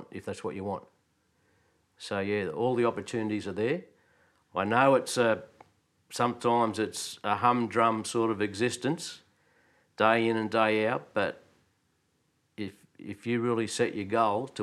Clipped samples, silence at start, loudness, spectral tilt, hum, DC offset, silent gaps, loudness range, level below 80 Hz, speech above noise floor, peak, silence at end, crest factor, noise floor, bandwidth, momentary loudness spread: under 0.1%; 0 s; -29 LUFS; -5 dB/octave; none; under 0.1%; none; 5 LU; -76 dBFS; 45 dB; -8 dBFS; 0 s; 22 dB; -73 dBFS; 13.5 kHz; 15 LU